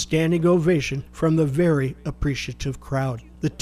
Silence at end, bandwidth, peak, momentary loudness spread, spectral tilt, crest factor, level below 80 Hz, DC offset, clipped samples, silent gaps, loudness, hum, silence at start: 0.05 s; 14 kHz; -8 dBFS; 10 LU; -6.5 dB/octave; 14 dB; -40 dBFS; under 0.1%; under 0.1%; none; -23 LUFS; none; 0 s